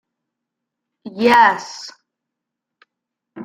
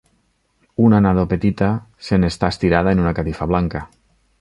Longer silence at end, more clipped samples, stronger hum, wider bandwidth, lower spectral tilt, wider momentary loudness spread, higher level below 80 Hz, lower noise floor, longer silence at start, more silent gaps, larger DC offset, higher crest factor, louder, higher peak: second, 0 s vs 0.55 s; neither; neither; first, 16 kHz vs 11 kHz; second, -3.5 dB/octave vs -8 dB/octave; first, 24 LU vs 10 LU; second, -68 dBFS vs -34 dBFS; first, -82 dBFS vs -63 dBFS; first, 1.05 s vs 0.8 s; neither; neither; about the same, 20 dB vs 16 dB; first, -14 LUFS vs -18 LUFS; about the same, -2 dBFS vs -2 dBFS